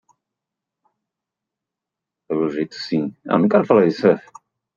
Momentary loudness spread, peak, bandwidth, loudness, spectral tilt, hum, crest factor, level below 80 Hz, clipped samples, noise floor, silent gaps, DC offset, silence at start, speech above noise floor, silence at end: 9 LU; -2 dBFS; 7.4 kHz; -19 LUFS; -7.5 dB/octave; none; 20 dB; -68 dBFS; under 0.1%; -85 dBFS; none; under 0.1%; 2.3 s; 67 dB; 0.55 s